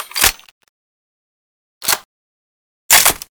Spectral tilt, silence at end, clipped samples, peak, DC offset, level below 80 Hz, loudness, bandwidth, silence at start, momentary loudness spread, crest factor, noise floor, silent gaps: 1 dB/octave; 0.15 s; under 0.1%; 0 dBFS; under 0.1%; -42 dBFS; -13 LUFS; over 20 kHz; 0 s; 10 LU; 20 dB; under -90 dBFS; 0.51-0.61 s, 0.69-1.81 s, 2.05-2.89 s